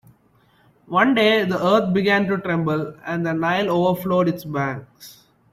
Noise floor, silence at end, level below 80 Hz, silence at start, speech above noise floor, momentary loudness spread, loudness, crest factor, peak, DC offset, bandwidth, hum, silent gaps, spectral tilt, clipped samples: -58 dBFS; 0.4 s; -60 dBFS; 0.9 s; 38 dB; 9 LU; -20 LUFS; 16 dB; -4 dBFS; under 0.1%; 15.5 kHz; none; none; -6.5 dB/octave; under 0.1%